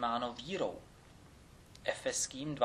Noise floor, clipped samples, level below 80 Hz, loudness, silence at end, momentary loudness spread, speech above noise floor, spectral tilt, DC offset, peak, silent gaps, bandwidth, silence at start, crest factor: -58 dBFS; under 0.1%; -64 dBFS; -38 LUFS; 0 s; 23 LU; 21 dB; -3 dB/octave; under 0.1%; -18 dBFS; none; 14 kHz; 0 s; 22 dB